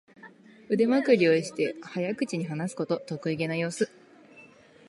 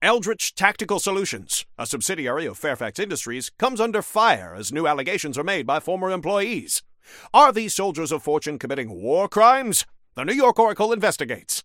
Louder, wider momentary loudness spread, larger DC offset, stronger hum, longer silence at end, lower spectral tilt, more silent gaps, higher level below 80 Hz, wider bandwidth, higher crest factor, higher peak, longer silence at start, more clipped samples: second, -27 LUFS vs -22 LUFS; about the same, 11 LU vs 11 LU; neither; neither; first, 0.45 s vs 0.05 s; first, -6 dB/octave vs -2.5 dB/octave; neither; second, -76 dBFS vs -62 dBFS; second, 11.5 kHz vs 17 kHz; about the same, 20 dB vs 22 dB; second, -8 dBFS vs 0 dBFS; first, 0.25 s vs 0 s; neither